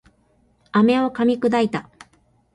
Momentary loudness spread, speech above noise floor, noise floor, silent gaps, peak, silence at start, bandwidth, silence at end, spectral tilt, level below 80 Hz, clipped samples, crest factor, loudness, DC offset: 7 LU; 42 dB; -61 dBFS; none; -6 dBFS; 0.75 s; 11 kHz; 0.7 s; -7 dB/octave; -60 dBFS; under 0.1%; 16 dB; -20 LUFS; under 0.1%